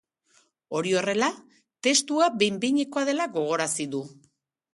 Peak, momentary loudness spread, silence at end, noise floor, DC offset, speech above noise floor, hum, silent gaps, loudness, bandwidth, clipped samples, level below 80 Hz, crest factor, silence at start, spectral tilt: -8 dBFS; 11 LU; 0.6 s; -65 dBFS; under 0.1%; 40 dB; none; none; -25 LUFS; 11.5 kHz; under 0.1%; -74 dBFS; 18 dB; 0.7 s; -3 dB/octave